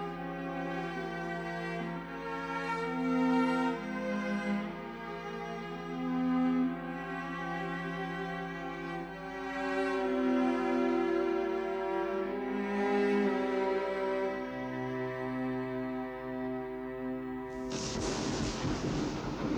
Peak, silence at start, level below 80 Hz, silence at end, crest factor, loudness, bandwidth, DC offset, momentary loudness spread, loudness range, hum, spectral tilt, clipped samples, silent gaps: -18 dBFS; 0 s; -56 dBFS; 0 s; 14 dB; -34 LUFS; 10 kHz; under 0.1%; 9 LU; 5 LU; none; -5.5 dB/octave; under 0.1%; none